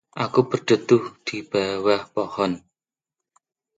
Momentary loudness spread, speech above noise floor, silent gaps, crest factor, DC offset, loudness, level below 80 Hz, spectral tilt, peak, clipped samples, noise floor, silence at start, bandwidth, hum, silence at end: 10 LU; 67 dB; none; 20 dB; under 0.1%; -22 LUFS; -62 dBFS; -5.5 dB/octave; -4 dBFS; under 0.1%; -89 dBFS; 0.15 s; 9 kHz; none; 1.2 s